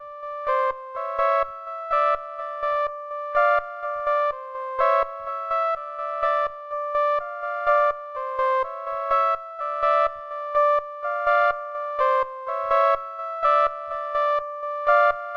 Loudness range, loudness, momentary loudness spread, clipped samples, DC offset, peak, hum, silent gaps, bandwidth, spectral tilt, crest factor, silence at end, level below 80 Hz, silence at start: 2 LU; -24 LUFS; 10 LU; under 0.1%; under 0.1%; -6 dBFS; none; none; 6.8 kHz; -2.5 dB/octave; 18 dB; 0 s; -58 dBFS; 0 s